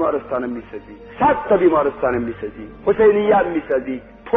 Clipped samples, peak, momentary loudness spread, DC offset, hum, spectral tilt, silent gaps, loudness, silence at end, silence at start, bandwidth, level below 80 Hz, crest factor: under 0.1%; -4 dBFS; 17 LU; under 0.1%; none; -5.5 dB/octave; none; -18 LUFS; 0 s; 0 s; 3.9 kHz; -46 dBFS; 14 dB